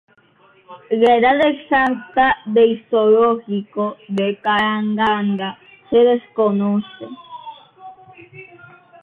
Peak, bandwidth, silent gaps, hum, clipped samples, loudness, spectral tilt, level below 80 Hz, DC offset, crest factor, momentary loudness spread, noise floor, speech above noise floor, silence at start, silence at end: -4 dBFS; 4.5 kHz; none; none; under 0.1%; -17 LUFS; -7.5 dB/octave; -56 dBFS; under 0.1%; 16 dB; 16 LU; -53 dBFS; 37 dB; 0.7 s; 0.6 s